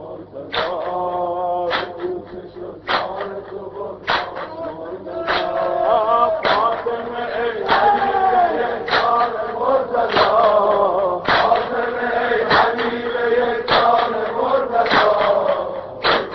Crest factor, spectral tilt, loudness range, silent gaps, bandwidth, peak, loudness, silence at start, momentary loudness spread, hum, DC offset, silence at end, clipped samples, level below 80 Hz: 16 dB; -1 dB/octave; 7 LU; none; 6.2 kHz; -2 dBFS; -18 LUFS; 0 s; 14 LU; none; under 0.1%; 0 s; under 0.1%; -50 dBFS